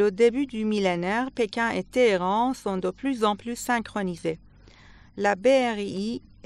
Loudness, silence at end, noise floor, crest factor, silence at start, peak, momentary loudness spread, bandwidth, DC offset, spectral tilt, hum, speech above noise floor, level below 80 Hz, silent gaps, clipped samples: -25 LUFS; 0.25 s; -51 dBFS; 16 dB; 0 s; -10 dBFS; 10 LU; 13 kHz; under 0.1%; -5 dB/octave; none; 26 dB; -56 dBFS; none; under 0.1%